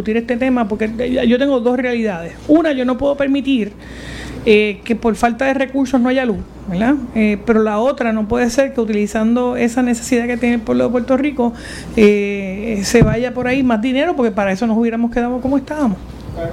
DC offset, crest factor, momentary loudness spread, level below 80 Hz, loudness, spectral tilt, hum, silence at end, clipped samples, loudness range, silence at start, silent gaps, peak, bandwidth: under 0.1%; 16 dB; 8 LU; -36 dBFS; -16 LUFS; -6 dB/octave; none; 0 s; under 0.1%; 1 LU; 0 s; none; 0 dBFS; 13.5 kHz